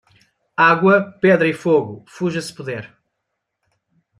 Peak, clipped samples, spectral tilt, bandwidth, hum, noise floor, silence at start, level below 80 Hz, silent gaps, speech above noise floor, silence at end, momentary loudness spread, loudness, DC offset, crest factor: -2 dBFS; under 0.1%; -6.5 dB/octave; 13.5 kHz; none; -77 dBFS; 0.6 s; -64 dBFS; none; 60 dB; 1.35 s; 16 LU; -17 LUFS; under 0.1%; 18 dB